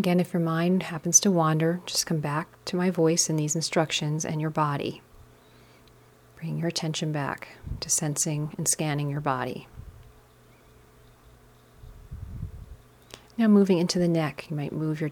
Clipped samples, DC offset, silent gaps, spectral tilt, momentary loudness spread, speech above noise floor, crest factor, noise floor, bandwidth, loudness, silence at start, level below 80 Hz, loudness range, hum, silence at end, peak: under 0.1%; under 0.1%; none; -4.5 dB/octave; 19 LU; 30 dB; 22 dB; -56 dBFS; 18 kHz; -25 LUFS; 0 s; -52 dBFS; 13 LU; none; 0 s; -4 dBFS